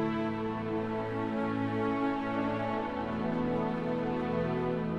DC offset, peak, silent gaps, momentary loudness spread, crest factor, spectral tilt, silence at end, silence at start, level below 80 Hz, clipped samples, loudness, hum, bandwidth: under 0.1%; -20 dBFS; none; 2 LU; 12 dB; -8.5 dB/octave; 0 s; 0 s; -56 dBFS; under 0.1%; -33 LUFS; none; 8 kHz